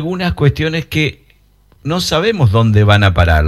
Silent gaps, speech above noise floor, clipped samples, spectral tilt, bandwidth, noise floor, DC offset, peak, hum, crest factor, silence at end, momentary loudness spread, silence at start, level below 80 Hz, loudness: none; 38 dB; 0.1%; -6 dB/octave; 13.5 kHz; -50 dBFS; under 0.1%; 0 dBFS; none; 12 dB; 0 s; 8 LU; 0 s; -26 dBFS; -13 LUFS